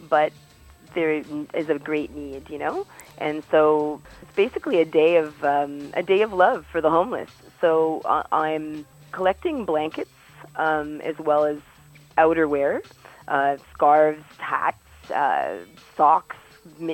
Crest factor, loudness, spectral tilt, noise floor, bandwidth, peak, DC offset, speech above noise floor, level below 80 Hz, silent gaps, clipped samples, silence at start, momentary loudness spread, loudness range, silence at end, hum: 18 dB; -23 LUFS; -6 dB/octave; -49 dBFS; 17 kHz; -6 dBFS; under 0.1%; 27 dB; -56 dBFS; none; under 0.1%; 0 s; 16 LU; 4 LU; 0 s; none